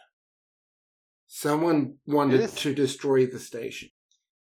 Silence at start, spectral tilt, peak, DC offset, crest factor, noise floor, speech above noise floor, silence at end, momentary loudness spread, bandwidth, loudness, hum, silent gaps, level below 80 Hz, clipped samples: 1.3 s; -5.5 dB/octave; -8 dBFS; under 0.1%; 18 dB; under -90 dBFS; over 65 dB; 0.55 s; 13 LU; 16.5 kHz; -25 LUFS; none; none; -74 dBFS; under 0.1%